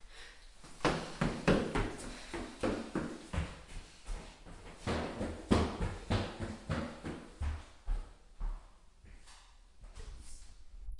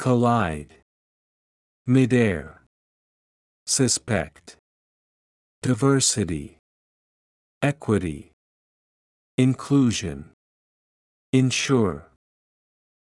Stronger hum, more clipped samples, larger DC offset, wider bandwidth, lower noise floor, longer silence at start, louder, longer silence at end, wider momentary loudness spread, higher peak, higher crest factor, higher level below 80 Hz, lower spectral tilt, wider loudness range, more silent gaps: neither; neither; neither; about the same, 11.5 kHz vs 12 kHz; second, -58 dBFS vs under -90 dBFS; about the same, 0 s vs 0 s; second, -38 LUFS vs -22 LUFS; second, 0 s vs 1.15 s; first, 23 LU vs 16 LU; second, -14 dBFS vs -6 dBFS; first, 26 dB vs 18 dB; first, -46 dBFS vs -54 dBFS; about the same, -6 dB/octave vs -5 dB/octave; first, 11 LU vs 4 LU; second, none vs 0.82-1.85 s, 2.67-3.66 s, 4.59-5.62 s, 6.59-7.61 s, 8.33-9.38 s, 10.33-11.33 s